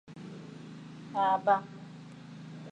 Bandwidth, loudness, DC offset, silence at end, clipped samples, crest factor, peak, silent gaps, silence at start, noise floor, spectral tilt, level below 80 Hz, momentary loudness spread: 9 kHz; -29 LUFS; under 0.1%; 0 s; under 0.1%; 22 dB; -12 dBFS; none; 0.1 s; -48 dBFS; -6.5 dB/octave; -78 dBFS; 20 LU